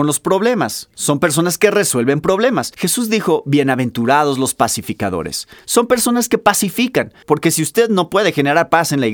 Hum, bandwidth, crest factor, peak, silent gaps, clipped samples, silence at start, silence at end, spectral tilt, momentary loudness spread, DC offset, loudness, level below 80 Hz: none; over 20 kHz; 16 dB; 0 dBFS; none; under 0.1%; 0 s; 0 s; -4 dB/octave; 6 LU; under 0.1%; -15 LUFS; -52 dBFS